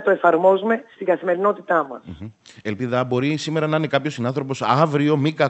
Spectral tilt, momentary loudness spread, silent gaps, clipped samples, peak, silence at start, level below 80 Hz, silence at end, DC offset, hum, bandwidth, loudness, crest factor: -6.5 dB/octave; 14 LU; none; under 0.1%; -2 dBFS; 0 s; -62 dBFS; 0 s; under 0.1%; none; 8.6 kHz; -20 LUFS; 18 dB